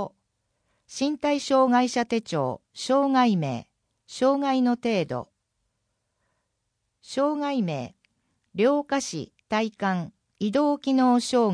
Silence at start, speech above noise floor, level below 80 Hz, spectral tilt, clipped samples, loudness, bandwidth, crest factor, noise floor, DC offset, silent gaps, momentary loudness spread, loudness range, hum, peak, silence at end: 0 s; 54 dB; -68 dBFS; -5.5 dB/octave; under 0.1%; -25 LUFS; 10.5 kHz; 16 dB; -78 dBFS; under 0.1%; none; 14 LU; 6 LU; none; -10 dBFS; 0 s